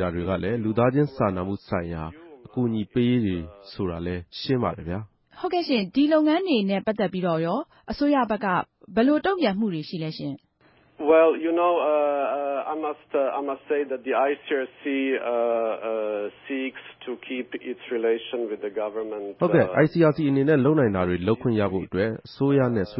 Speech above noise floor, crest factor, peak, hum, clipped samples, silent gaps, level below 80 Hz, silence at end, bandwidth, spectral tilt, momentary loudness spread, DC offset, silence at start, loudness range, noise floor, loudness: 36 dB; 18 dB; -6 dBFS; none; under 0.1%; none; -50 dBFS; 0 s; 5.8 kHz; -11.5 dB/octave; 12 LU; under 0.1%; 0 s; 6 LU; -60 dBFS; -24 LUFS